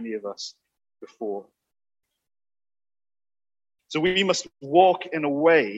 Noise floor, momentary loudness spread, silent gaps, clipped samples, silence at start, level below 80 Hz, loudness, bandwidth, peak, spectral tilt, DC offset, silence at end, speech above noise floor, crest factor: under -90 dBFS; 17 LU; none; under 0.1%; 0 s; -70 dBFS; -23 LUFS; 8.4 kHz; -4 dBFS; -4 dB/octave; under 0.1%; 0 s; over 67 dB; 22 dB